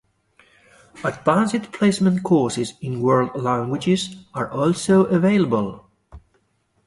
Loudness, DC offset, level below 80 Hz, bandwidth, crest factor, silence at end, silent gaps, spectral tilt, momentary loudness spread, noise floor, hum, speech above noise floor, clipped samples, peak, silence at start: -20 LUFS; under 0.1%; -54 dBFS; 11.5 kHz; 18 dB; 0.7 s; none; -6 dB/octave; 10 LU; -66 dBFS; none; 46 dB; under 0.1%; -2 dBFS; 0.95 s